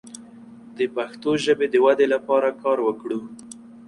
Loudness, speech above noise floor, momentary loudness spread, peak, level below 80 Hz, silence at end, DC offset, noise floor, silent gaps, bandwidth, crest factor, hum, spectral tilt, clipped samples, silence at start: -22 LUFS; 23 dB; 23 LU; -6 dBFS; -66 dBFS; 0.1 s; under 0.1%; -44 dBFS; none; 11.5 kHz; 16 dB; none; -4.5 dB/octave; under 0.1%; 0.05 s